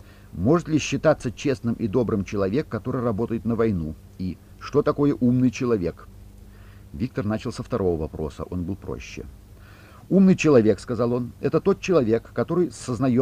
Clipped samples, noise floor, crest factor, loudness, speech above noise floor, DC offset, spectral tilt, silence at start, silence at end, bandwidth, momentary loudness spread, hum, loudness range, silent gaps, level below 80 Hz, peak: under 0.1%; -46 dBFS; 18 dB; -23 LUFS; 23 dB; under 0.1%; -7 dB/octave; 0.35 s; 0 s; 14.5 kHz; 14 LU; 50 Hz at -50 dBFS; 8 LU; none; -46 dBFS; -6 dBFS